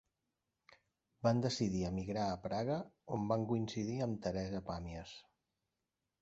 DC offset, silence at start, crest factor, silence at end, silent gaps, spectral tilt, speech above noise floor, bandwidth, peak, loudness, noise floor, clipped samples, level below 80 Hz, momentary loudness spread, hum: under 0.1%; 1.2 s; 22 dB; 1 s; none; -6.5 dB/octave; 51 dB; 8 kHz; -18 dBFS; -39 LUFS; -89 dBFS; under 0.1%; -60 dBFS; 10 LU; none